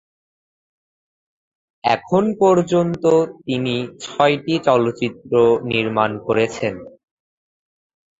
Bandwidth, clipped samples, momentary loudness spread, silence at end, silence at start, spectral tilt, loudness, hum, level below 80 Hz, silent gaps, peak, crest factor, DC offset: 7.8 kHz; under 0.1%; 9 LU; 1.3 s; 1.85 s; -6 dB/octave; -18 LUFS; none; -56 dBFS; none; 0 dBFS; 20 dB; under 0.1%